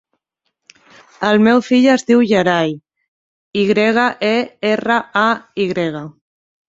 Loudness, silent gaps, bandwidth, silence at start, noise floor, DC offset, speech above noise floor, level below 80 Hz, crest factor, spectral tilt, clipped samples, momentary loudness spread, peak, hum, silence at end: -15 LUFS; 3.08-3.51 s; 7.8 kHz; 1.2 s; -73 dBFS; under 0.1%; 58 dB; -58 dBFS; 16 dB; -5.5 dB/octave; under 0.1%; 10 LU; -2 dBFS; none; 0.6 s